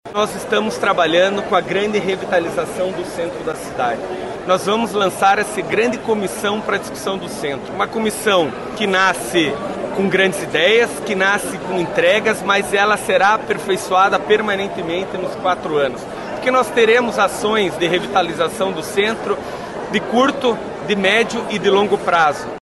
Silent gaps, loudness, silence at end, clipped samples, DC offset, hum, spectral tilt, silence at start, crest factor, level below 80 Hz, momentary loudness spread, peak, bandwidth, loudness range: none; -17 LUFS; 0.05 s; under 0.1%; under 0.1%; none; -4 dB/octave; 0.05 s; 14 dB; -50 dBFS; 9 LU; -4 dBFS; 12.5 kHz; 3 LU